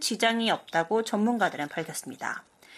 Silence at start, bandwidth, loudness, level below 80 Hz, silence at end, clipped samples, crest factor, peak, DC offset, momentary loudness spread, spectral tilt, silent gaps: 0 s; 15 kHz; -28 LUFS; -76 dBFS; 0 s; under 0.1%; 18 dB; -10 dBFS; under 0.1%; 10 LU; -3.5 dB/octave; none